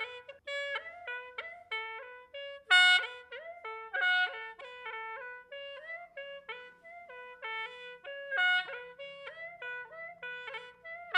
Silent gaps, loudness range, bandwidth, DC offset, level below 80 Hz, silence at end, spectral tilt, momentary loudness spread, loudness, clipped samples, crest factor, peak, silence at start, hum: none; 14 LU; 11.5 kHz; under 0.1%; -82 dBFS; 0 s; 1.5 dB/octave; 18 LU; -32 LUFS; under 0.1%; 24 dB; -10 dBFS; 0 s; none